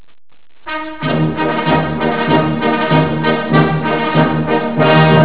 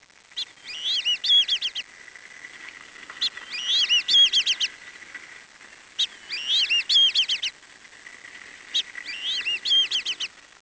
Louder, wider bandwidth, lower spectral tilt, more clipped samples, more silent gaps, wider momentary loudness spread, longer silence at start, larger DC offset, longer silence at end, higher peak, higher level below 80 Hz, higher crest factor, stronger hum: first, -14 LUFS vs -21 LUFS; second, 4 kHz vs 8 kHz; first, -10.5 dB/octave vs 3 dB/octave; neither; neither; second, 8 LU vs 24 LU; first, 0.65 s vs 0.35 s; first, 2% vs under 0.1%; second, 0 s vs 0.2 s; first, 0 dBFS vs -10 dBFS; first, -40 dBFS vs -72 dBFS; about the same, 14 dB vs 16 dB; neither